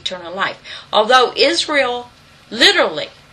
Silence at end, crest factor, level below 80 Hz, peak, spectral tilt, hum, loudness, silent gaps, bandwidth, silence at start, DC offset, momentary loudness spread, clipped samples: 0.25 s; 16 dB; -56 dBFS; 0 dBFS; -1.5 dB/octave; none; -14 LUFS; none; 13.5 kHz; 0.05 s; under 0.1%; 16 LU; under 0.1%